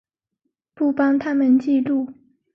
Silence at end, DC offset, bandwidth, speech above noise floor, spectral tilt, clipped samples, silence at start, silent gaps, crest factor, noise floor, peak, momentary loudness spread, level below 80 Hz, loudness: 0.45 s; under 0.1%; 6 kHz; 58 dB; -7.5 dB/octave; under 0.1%; 0.8 s; none; 12 dB; -77 dBFS; -8 dBFS; 7 LU; -66 dBFS; -19 LUFS